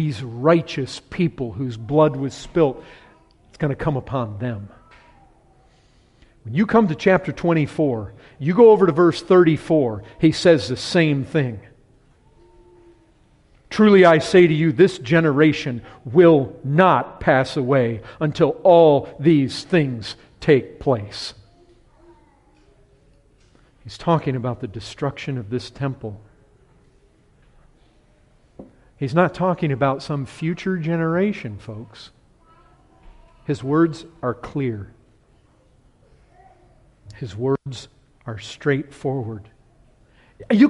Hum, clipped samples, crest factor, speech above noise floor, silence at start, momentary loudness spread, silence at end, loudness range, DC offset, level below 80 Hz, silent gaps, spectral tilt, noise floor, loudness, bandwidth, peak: none; under 0.1%; 18 dB; 38 dB; 0 s; 18 LU; 0 s; 14 LU; under 0.1%; -50 dBFS; none; -7 dB/octave; -56 dBFS; -19 LUFS; 11.5 kHz; -2 dBFS